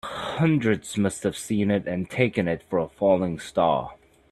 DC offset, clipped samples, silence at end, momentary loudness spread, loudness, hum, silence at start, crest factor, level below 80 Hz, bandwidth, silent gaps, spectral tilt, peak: under 0.1%; under 0.1%; 0.35 s; 6 LU; -25 LUFS; none; 0.05 s; 20 dB; -56 dBFS; 13.5 kHz; none; -6 dB/octave; -6 dBFS